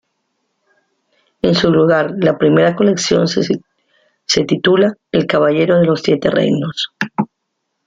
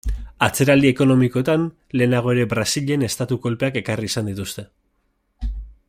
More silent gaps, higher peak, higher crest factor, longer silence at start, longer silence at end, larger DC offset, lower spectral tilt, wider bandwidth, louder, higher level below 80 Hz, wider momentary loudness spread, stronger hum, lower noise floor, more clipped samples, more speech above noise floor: neither; about the same, 0 dBFS vs -2 dBFS; about the same, 14 dB vs 18 dB; first, 1.45 s vs 0.05 s; first, 0.6 s vs 0.2 s; neither; about the same, -5.5 dB/octave vs -5.5 dB/octave; second, 9.2 kHz vs 16 kHz; first, -14 LUFS vs -19 LUFS; second, -52 dBFS vs -36 dBFS; second, 9 LU vs 16 LU; neither; first, -73 dBFS vs -68 dBFS; neither; first, 59 dB vs 49 dB